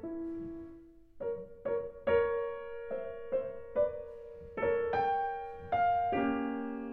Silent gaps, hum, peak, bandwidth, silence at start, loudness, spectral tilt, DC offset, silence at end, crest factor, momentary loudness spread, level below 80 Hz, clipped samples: none; none; -18 dBFS; 5.2 kHz; 0 s; -34 LUFS; -8.5 dB/octave; under 0.1%; 0 s; 16 dB; 14 LU; -60 dBFS; under 0.1%